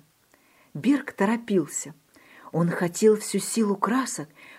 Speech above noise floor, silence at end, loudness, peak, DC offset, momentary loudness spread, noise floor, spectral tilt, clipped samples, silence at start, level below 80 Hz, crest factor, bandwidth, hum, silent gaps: 37 dB; 0 s; -25 LUFS; -8 dBFS; under 0.1%; 11 LU; -61 dBFS; -5 dB/octave; under 0.1%; 0.75 s; -74 dBFS; 18 dB; 16 kHz; none; none